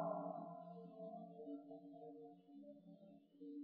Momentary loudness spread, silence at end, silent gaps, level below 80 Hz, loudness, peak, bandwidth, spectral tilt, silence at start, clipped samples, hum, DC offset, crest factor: 13 LU; 0 s; none; under -90 dBFS; -55 LUFS; -32 dBFS; 4.8 kHz; -9.5 dB/octave; 0 s; under 0.1%; none; under 0.1%; 20 dB